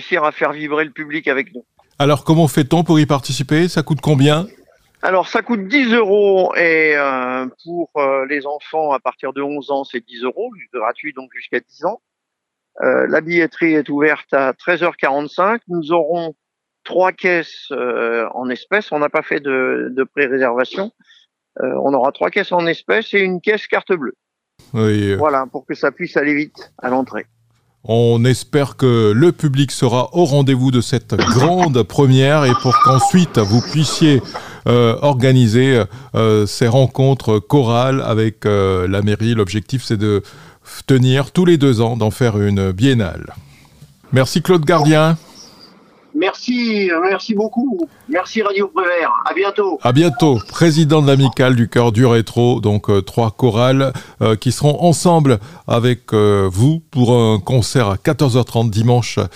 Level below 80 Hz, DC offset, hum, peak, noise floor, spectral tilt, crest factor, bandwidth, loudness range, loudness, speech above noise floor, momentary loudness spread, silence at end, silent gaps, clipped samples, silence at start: -52 dBFS; under 0.1%; none; 0 dBFS; -78 dBFS; -6.5 dB/octave; 14 dB; 15.5 kHz; 6 LU; -15 LUFS; 63 dB; 10 LU; 0.05 s; none; under 0.1%; 0 s